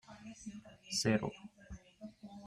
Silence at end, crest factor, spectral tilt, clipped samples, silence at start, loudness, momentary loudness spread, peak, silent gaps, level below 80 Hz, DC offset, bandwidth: 0 s; 22 dB; -4 dB/octave; under 0.1%; 0.1 s; -36 LUFS; 22 LU; -18 dBFS; none; -64 dBFS; under 0.1%; 14.5 kHz